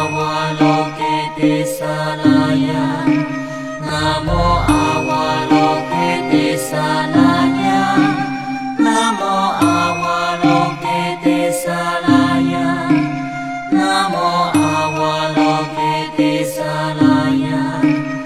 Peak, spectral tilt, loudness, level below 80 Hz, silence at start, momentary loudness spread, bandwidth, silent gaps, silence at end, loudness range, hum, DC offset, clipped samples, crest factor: 0 dBFS; -5.5 dB/octave; -16 LUFS; -36 dBFS; 0 s; 6 LU; 15 kHz; none; 0 s; 2 LU; none; 0.4%; under 0.1%; 16 dB